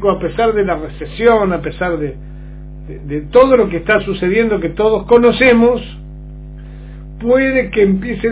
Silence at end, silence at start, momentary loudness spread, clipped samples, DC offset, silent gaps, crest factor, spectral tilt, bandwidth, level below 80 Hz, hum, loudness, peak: 0 s; 0 s; 24 LU; 0.2%; under 0.1%; none; 14 dB; -10.5 dB/octave; 4 kHz; -32 dBFS; 50 Hz at -30 dBFS; -13 LUFS; 0 dBFS